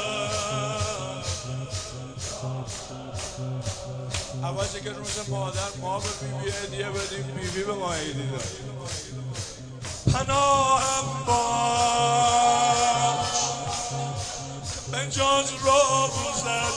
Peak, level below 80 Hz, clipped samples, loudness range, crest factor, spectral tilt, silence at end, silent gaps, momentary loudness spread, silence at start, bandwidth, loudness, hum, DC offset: -8 dBFS; -46 dBFS; under 0.1%; 10 LU; 18 dB; -3 dB/octave; 0 s; none; 13 LU; 0 s; 10 kHz; -26 LUFS; none; under 0.1%